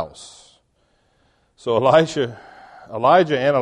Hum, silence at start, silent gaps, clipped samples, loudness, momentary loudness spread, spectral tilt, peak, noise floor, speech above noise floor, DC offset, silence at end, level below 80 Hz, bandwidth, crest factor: none; 0 s; none; under 0.1%; -17 LUFS; 17 LU; -5.5 dB/octave; -2 dBFS; -63 dBFS; 46 dB; under 0.1%; 0 s; -58 dBFS; 10.5 kHz; 18 dB